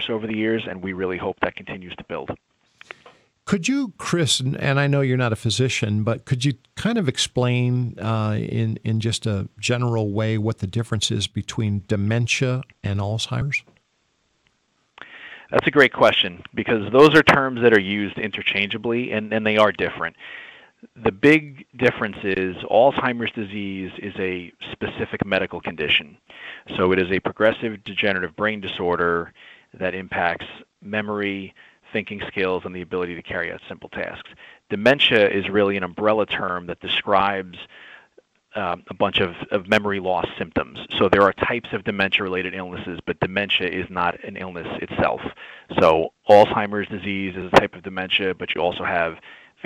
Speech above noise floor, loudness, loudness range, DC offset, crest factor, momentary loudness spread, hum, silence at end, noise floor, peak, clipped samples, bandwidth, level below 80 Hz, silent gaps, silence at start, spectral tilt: 46 dB; -21 LUFS; 8 LU; under 0.1%; 20 dB; 15 LU; none; 0.3 s; -68 dBFS; -2 dBFS; under 0.1%; 13 kHz; -52 dBFS; none; 0 s; -5 dB/octave